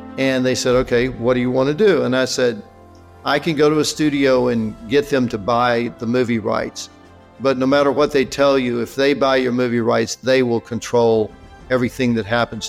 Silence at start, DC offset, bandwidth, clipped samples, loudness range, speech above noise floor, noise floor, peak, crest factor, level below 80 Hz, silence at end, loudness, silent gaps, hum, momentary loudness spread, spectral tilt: 0 s; under 0.1%; 15.5 kHz; under 0.1%; 2 LU; 26 dB; -43 dBFS; -6 dBFS; 12 dB; -46 dBFS; 0 s; -18 LUFS; none; none; 6 LU; -5 dB/octave